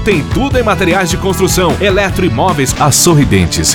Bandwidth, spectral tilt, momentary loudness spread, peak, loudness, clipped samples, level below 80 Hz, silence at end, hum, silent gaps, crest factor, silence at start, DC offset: 18 kHz; -4 dB/octave; 5 LU; 0 dBFS; -10 LUFS; under 0.1%; -24 dBFS; 0 s; none; none; 10 dB; 0 s; under 0.1%